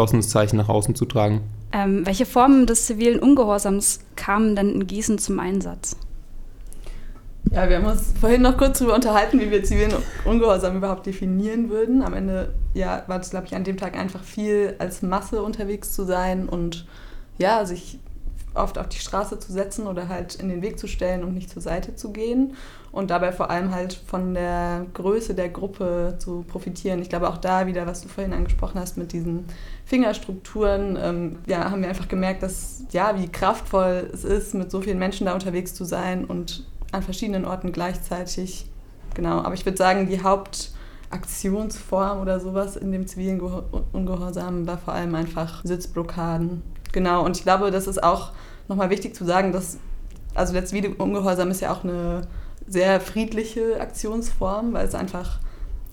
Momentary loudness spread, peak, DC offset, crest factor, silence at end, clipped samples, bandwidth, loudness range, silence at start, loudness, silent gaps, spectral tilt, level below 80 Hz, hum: 12 LU; -2 dBFS; under 0.1%; 20 dB; 0 s; under 0.1%; 18 kHz; 8 LU; 0 s; -23 LUFS; none; -5.5 dB/octave; -30 dBFS; none